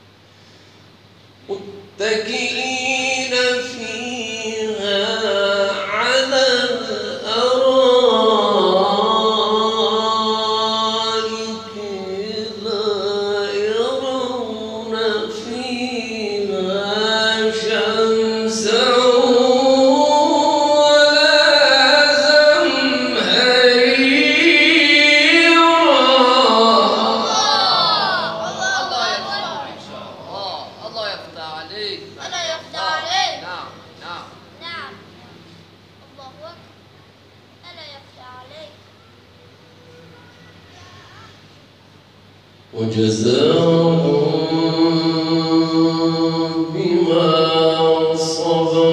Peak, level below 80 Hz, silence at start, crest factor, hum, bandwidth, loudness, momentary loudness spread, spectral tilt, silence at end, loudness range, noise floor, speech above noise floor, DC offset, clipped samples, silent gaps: 0 dBFS; -64 dBFS; 1.5 s; 16 dB; none; 11 kHz; -15 LUFS; 17 LU; -3.5 dB/octave; 0 s; 13 LU; -47 dBFS; 25 dB; under 0.1%; under 0.1%; none